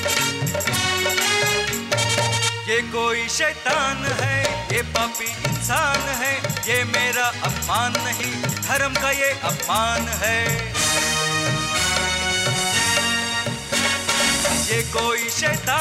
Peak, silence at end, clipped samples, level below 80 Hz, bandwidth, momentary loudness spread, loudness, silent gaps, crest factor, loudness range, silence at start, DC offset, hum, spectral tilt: -4 dBFS; 0 s; under 0.1%; -42 dBFS; 16 kHz; 5 LU; -20 LUFS; none; 18 dB; 2 LU; 0 s; under 0.1%; none; -2.5 dB/octave